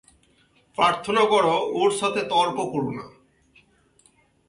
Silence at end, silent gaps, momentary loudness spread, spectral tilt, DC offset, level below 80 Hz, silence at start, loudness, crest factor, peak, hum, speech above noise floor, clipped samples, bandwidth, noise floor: 1.4 s; none; 11 LU; -4 dB/octave; under 0.1%; -62 dBFS; 0.8 s; -22 LUFS; 18 dB; -6 dBFS; none; 39 dB; under 0.1%; 11.5 kHz; -61 dBFS